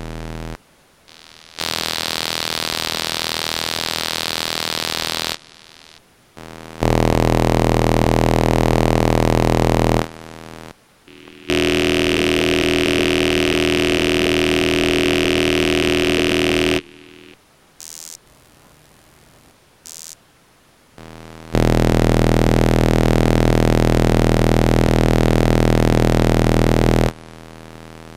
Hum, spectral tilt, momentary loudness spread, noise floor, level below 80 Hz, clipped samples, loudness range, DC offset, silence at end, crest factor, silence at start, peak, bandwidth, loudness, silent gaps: none; -5 dB/octave; 19 LU; -53 dBFS; -28 dBFS; under 0.1%; 7 LU; under 0.1%; 0 s; 18 dB; 0 s; 0 dBFS; 16.5 kHz; -17 LUFS; none